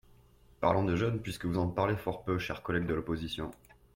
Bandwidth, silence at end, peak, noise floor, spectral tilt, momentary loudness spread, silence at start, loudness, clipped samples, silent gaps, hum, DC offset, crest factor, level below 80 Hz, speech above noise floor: 16.5 kHz; 0.4 s; -14 dBFS; -61 dBFS; -7 dB/octave; 7 LU; 0.6 s; -33 LUFS; under 0.1%; none; none; under 0.1%; 20 dB; -54 dBFS; 29 dB